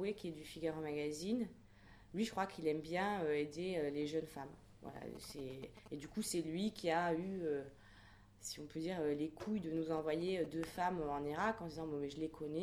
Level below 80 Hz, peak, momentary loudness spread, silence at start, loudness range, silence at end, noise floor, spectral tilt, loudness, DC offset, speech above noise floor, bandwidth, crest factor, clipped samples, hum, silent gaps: -66 dBFS; -26 dBFS; 12 LU; 0 s; 3 LU; 0 s; -62 dBFS; -5 dB/octave; -42 LUFS; under 0.1%; 21 dB; 20 kHz; 16 dB; under 0.1%; none; none